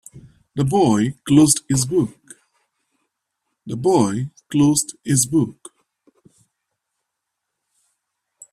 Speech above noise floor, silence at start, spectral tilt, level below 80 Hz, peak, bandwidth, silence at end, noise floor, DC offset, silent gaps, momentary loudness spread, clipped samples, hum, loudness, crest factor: 62 dB; 0.15 s; -5 dB/octave; -54 dBFS; 0 dBFS; 14.5 kHz; 3 s; -80 dBFS; under 0.1%; none; 12 LU; under 0.1%; none; -18 LUFS; 20 dB